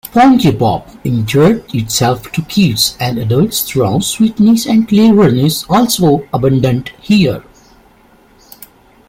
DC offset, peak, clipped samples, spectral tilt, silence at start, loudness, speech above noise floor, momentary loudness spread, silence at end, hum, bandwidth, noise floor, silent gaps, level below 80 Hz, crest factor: under 0.1%; 0 dBFS; under 0.1%; -5.5 dB/octave; 0.15 s; -12 LUFS; 35 dB; 8 LU; 1.7 s; none; 16.5 kHz; -46 dBFS; none; -40 dBFS; 12 dB